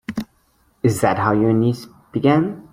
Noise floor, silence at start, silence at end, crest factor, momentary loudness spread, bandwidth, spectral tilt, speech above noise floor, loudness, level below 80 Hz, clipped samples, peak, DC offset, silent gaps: -60 dBFS; 0.1 s; 0.1 s; 18 dB; 14 LU; 16.5 kHz; -7 dB/octave; 43 dB; -19 LUFS; -52 dBFS; under 0.1%; -2 dBFS; under 0.1%; none